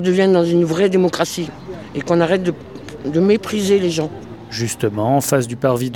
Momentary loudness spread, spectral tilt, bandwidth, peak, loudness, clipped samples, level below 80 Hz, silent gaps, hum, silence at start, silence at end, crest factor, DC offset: 14 LU; -5.5 dB/octave; 19 kHz; -2 dBFS; -17 LUFS; under 0.1%; -50 dBFS; none; none; 0 s; 0 s; 16 dB; 0.3%